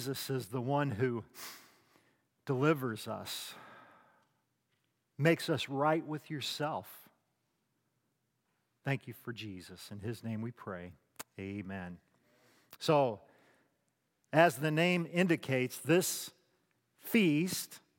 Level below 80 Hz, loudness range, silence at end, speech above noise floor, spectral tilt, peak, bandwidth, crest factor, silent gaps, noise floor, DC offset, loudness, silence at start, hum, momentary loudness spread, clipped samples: -80 dBFS; 12 LU; 0.2 s; 47 dB; -5 dB/octave; -10 dBFS; 17 kHz; 26 dB; none; -81 dBFS; under 0.1%; -34 LUFS; 0 s; none; 18 LU; under 0.1%